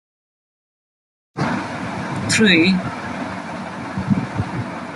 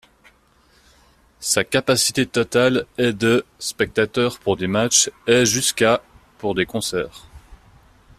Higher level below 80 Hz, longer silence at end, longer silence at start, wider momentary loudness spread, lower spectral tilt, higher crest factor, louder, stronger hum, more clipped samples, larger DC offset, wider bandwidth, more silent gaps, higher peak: about the same, -50 dBFS vs -52 dBFS; second, 0 s vs 0.65 s; about the same, 1.35 s vs 1.4 s; first, 15 LU vs 9 LU; first, -4.5 dB/octave vs -3 dB/octave; about the same, 20 dB vs 20 dB; about the same, -20 LUFS vs -19 LUFS; neither; neither; neither; second, 12 kHz vs 15 kHz; neither; about the same, -2 dBFS vs -2 dBFS